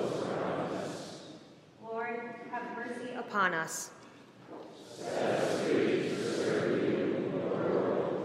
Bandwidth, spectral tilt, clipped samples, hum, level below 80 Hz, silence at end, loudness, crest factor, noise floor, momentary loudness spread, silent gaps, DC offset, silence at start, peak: 15.5 kHz; -5 dB/octave; under 0.1%; none; -80 dBFS; 0 s; -33 LUFS; 20 dB; -54 dBFS; 18 LU; none; under 0.1%; 0 s; -14 dBFS